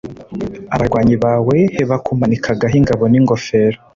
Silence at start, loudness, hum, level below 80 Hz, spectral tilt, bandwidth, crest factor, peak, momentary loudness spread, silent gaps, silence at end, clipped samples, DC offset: 0.05 s; -14 LUFS; none; -38 dBFS; -8 dB/octave; 7.6 kHz; 12 dB; -2 dBFS; 11 LU; none; 0.2 s; under 0.1%; under 0.1%